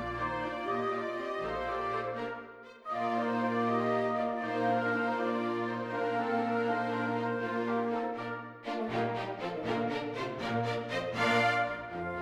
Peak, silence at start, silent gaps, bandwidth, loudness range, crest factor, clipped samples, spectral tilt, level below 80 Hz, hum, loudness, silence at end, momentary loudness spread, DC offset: -16 dBFS; 0 s; none; 12 kHz; 3 LU; 16 dB; under 0.1%; -6 dB/octave; -62 dBFS; none; -33 LUFS; 0 s; 7 LU; under 0.1%